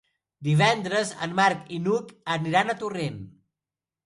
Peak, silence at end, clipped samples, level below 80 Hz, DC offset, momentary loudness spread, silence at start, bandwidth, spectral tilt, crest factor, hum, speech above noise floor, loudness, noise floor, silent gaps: -6 dBFS; 0.75 s; under 0.1%; -64 dBFS; under 0.1%; 11 LU; 0.4 s; 11.5 kHz; -5 dB/octave; 20 dB; none; over 65 dB; -25 LUFS; under -90 dBFS; none